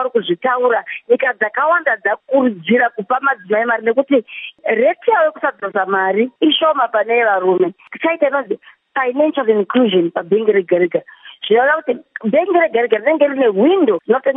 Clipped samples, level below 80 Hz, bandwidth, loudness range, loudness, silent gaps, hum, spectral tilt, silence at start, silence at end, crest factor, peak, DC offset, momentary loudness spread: under 0.1%; -76 dBFS; 3.9 kHz; 1 LU; -15 LUFS; none; none; -9.5 dB/octave; 0 s; 0 s; 14 dB; 0 dBFS; under 0.1%; 6 LU